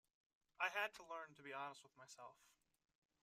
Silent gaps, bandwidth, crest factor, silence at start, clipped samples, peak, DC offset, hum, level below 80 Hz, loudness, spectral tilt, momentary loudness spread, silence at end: none; 15 kHz; 26 dB; 0.6 s; under 0.1%; -26 dBFS; under 0.1%; none; under -90 dBFS; -48 LUFS; -1.5 dB/octave; 20 LU; 0.75 s